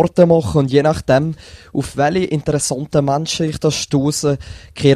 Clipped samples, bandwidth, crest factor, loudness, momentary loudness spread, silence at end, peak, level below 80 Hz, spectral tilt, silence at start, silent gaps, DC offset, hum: under 0.1%; 14 kHz; 16 dB; -17 LUFS; 11 LU; 0 s; 0 dBFS; -40 dBFS; -5.5 dB/octave; 0 s; none; under 0.1%; none